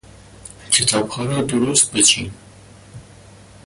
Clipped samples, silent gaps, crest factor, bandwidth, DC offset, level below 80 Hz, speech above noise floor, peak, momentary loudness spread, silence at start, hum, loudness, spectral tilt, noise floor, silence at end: under 0.1%; none; 20 dB; 11.5 kHz; under 0.1%; -50 dBFS; 26 dB; -2 dBFS; 9 LU; 0.45 s; none; -16 LUFS; -2 dB/octave; -44 dBFS; 0.65 s